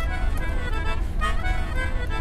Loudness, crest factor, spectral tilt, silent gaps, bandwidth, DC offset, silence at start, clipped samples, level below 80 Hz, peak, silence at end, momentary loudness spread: -28 LUFS; 12 dB; -5.5 dB/octave; none; 12.5 kHz; under 0.1%; 0 s; under 0.1%; -24 dBFS; -12 dBFS; 0 s; 2 LU